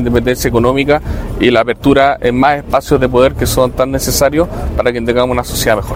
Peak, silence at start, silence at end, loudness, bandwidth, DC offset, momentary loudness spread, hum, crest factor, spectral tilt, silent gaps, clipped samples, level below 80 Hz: 0 dBFS; 0 s; 0 s; -12 LUFS; 16.5 kHz; under 0.1%; 5 LU; none; 12 dB; -5 dB/octave; none; 0.4%; -24 dBFS